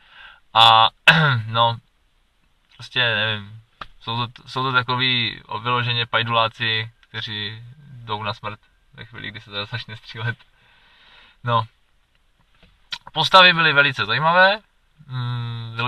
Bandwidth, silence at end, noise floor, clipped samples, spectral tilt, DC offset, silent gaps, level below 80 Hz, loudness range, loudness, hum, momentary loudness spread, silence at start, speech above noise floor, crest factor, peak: 14 kHz; 0 s; -62 dBFS; under 0.1%; -4.5 dB/octave; under 0.1%; none; -56 dBFS; 14 LU; -18 LUFS; none; 21 LU; 0.25 s; 42 dB; 22 dB; 0 dBFS